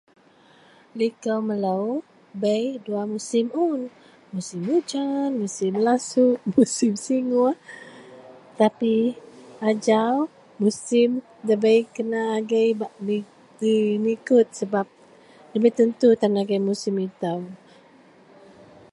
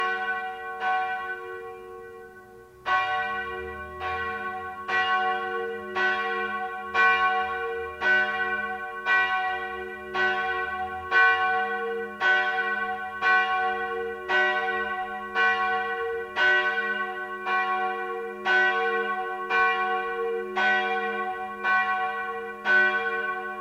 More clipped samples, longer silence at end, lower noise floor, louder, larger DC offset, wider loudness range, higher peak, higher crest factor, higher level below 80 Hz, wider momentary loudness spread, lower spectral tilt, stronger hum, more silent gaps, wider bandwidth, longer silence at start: neither; first, 1.35 s vs 0 s; first, -54 dBFS vs -48 dBFS; about the same, -23 LUFS vs -25 LUFS; neither; about the same, 4 LU vs 5 LU; first, -4 dBFS vs -8 dBFS; about the same, 20 dB vs 18 dB; second, -72 dBFS vs -60 dBFS; about the same, 11 LU vs 11 LU; first, -5.5 dB/octave vs -3.5 dB/octave; neither; neither; second, 11.5 kHz vs 15 kHz; first, 0.95 s vs 0 s